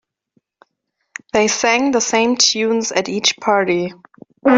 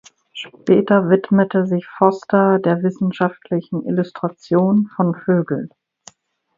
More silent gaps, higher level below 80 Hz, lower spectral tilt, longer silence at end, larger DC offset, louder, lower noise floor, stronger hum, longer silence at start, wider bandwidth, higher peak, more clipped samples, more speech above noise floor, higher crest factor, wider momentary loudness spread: neither; about the same, -60 dBFS vs -62 dBFS; second, -2 dB/octave vs -8.5 dB/octave; second, 0 s vs 0.9 s; neither; about the same, -16 LUFS vs -18 LUFS; first, -73 dBFS vs -48 dBFS; neither; first, 1.35 s vs 0.35 s; about the same, 7.8 kHz vs 7.4 kHz; about the same, -2 dBFS vs 0 dBFS; neither; first, 56 dB vs 31 dB; about the same, 16 dB vs 18 dB; second, 8 LU vs 11 LU